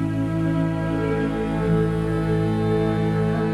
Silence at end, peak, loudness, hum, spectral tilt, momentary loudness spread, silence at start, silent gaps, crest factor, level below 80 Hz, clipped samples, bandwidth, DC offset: 0 s; -8 dBFS; -22 LUFS; none; -8.5 dB/octave; 2 LU; 0 s; none; 12 dB; -38 dBFS; under 0.1%; 11 kHz; under 0.1%